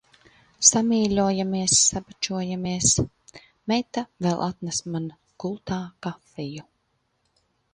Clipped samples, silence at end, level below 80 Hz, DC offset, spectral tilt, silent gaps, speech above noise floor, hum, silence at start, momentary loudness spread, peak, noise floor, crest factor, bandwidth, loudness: under 0.1%; 1.1 s; -52 dBFS; under 0.1%; -3.5 dB/octave; none; 48 dB; none; 0.6 s; 18 LU; -2 dBFS; -72 dBFS; 24 dB; 11 kHz; -23 LUFS